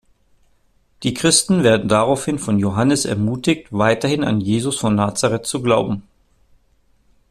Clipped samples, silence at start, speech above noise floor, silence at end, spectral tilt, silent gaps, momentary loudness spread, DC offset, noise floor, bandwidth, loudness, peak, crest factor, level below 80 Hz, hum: under 0.1%; 1 s; 41 dB; 1.3 s; -4.5 dB/octave; none; 6 LU; under 0.1%; -58 dBFS; 14 kHz; -18 LUFS; 0 dBFS; 18 dB; -50 dBFS; none